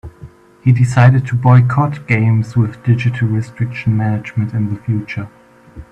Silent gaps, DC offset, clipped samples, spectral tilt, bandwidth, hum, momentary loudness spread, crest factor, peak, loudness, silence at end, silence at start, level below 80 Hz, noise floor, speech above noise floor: none; under 0.1%; under 0.1%; -8.5 dB/octave; 8.8 kHz; none; 10 LU; 14 dB; 0 dBFS; -15 LUFS; 0.1 s; 0.05 s; -46 dBFS; -39 dBFS; 25 dB